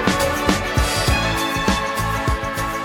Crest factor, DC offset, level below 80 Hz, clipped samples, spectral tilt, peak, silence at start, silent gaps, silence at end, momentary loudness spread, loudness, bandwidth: 18 dB; under 0.1%; -28 dBFS; under 0.1%; -4 dB/octave; -2 dBFS; 0 s; none; 0 s; 4 LU; -19 LUFS; 18 kHz